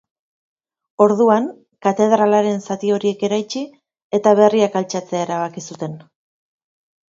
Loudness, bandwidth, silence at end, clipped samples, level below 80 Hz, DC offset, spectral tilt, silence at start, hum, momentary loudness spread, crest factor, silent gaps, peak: -17 LUFS; 7.8 kHz; 1.15 s; under 0.1%; -68 dBFS; under 0.1%; -5.5 dB/octave; 1 s; none; 16 LU; 18 dB; 4.02-4.10 s; 0 dBFS